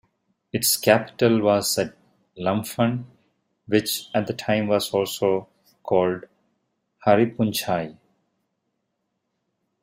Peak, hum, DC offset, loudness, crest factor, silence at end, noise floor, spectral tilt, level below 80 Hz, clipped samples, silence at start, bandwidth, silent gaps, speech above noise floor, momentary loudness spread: -2 dBFS; none; under 0.1%; -22 LUFS; 22 dB; 1.9 s; -77 dBFS; -4.5 dB/octave; -64 dBFS; under 0.1%; 0.55 s; 16 kHz; none; 55 dB; 9 LU